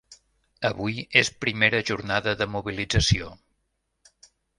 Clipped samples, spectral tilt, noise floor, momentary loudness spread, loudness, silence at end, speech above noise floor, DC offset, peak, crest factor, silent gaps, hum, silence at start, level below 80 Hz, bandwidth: under 0.1%; -4 dB/octave; -76 dBFS; 9 LU; -24 LUFS; 1.25 s; 51 dB; under 0.1%; -2 dBFS; 26 dB; none; none; 0.1 s; -42 dBFS; 11.5 kHz